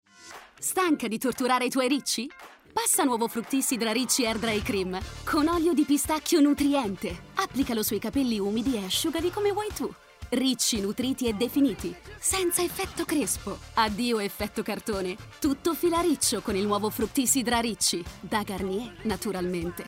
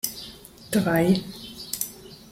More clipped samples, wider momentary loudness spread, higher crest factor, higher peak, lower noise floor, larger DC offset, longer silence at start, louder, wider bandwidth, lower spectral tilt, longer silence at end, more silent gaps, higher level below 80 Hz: neither; second, 9 LU vs 20 LU; second, 16 dB vs 22 dB; second, -10 dBFS vs -6 dBFS; first, -48 dBFS vs -44 dBFS; neither; first, 0.2 s vs 0.05 s; about the same, -27 LUFS vs -25 LUFS; about the same, 16 kHz vs 16.5 kHz; second, -3 dB/octave vs -5 dB/octave; about the same, 0 s vs 0 s; neither; about the same, -50 dBFS vs -54 dBFS